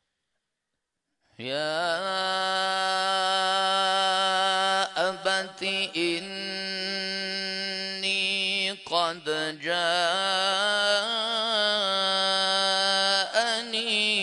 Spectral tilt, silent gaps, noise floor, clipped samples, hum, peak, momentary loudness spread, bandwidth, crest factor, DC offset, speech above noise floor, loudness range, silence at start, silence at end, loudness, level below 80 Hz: -1.5 dB/octave; none; -83 dBFS; under 0.1%; none; -10 dBFS; 7 LU; 11 kHz; 18 dB; under 0.1%; 56 dB; 4 LU; 1.4 s; 0 s; -25 LUFS; -82 dBFS